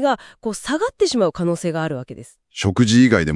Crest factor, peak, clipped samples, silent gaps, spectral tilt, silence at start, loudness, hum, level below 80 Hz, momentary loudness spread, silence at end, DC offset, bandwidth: 18 dB; 0 dBFS; under 0.1%; none; -5.5 dB/octave; 0 s; -19 LUFS; none; -48 dBFS; 17 LU; 0 s; under 0.1%; 12 kHz